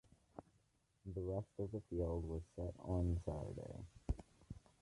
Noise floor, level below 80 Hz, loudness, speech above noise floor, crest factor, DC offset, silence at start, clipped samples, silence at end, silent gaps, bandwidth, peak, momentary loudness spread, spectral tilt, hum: -78 dBFS; -52 dBFS; -45 LUFS; 35 dB; 18 dB; under 0.1%; 0.35 s; under 0.1%; 0.25 s; none; 11 kHz; -28 dBFS; 17 LU; -9.5 dB/octave; none